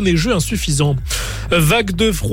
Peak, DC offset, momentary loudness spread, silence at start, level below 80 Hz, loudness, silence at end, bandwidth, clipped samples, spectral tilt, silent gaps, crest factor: -4 dBFS; under 0.1%; 7 LU; 0 s; -26 dBFS; -16 LUFS; 0 s; 17 kHz; under 0.1%; -4.5 dB/octave; none; 12 dB